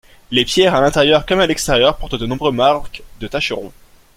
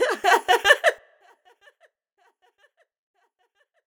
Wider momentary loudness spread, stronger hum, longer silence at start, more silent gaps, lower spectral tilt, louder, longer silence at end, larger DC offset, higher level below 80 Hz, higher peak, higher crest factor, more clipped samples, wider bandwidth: first, 12 LU vs 9 LU; neither; first, 0.3 s vs 0 s; neither; first, -4 dB/octave vs 0 dB/octave; first, -15 LUFS vs -19 LUFS; second, 0.5 s vs 2.9 s; neither; first, -34 dBFS vs -66 dBFS; about the same, 0 dBFS vs 0 dBFS; second, 16 dB vs 24 dB; neither; second, 16.5 kHz vs over 20 kHz